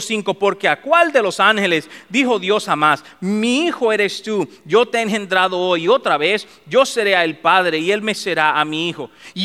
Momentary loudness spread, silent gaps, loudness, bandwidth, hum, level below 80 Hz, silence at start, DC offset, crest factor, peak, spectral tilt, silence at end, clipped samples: 7 LU; none; -17 LUFS; 15 kHz; none; -68 dBFS; 0 s; 0.1%; 16 dB; 0 dBFS; -3.5 dB/octave; 0 s; under 0.1%